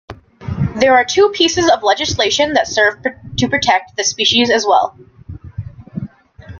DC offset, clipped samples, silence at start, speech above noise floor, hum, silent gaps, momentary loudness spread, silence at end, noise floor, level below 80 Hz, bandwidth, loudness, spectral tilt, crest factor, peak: under 0.1%; under 0.1%; 0.1 s; 23 dB; none; none; 19 LU; 0 s; -37 dBFS; -44 dBFS; 7.4 kHz; -14 LUFS; -3 dB/octave; 16 dB; 0 dBFS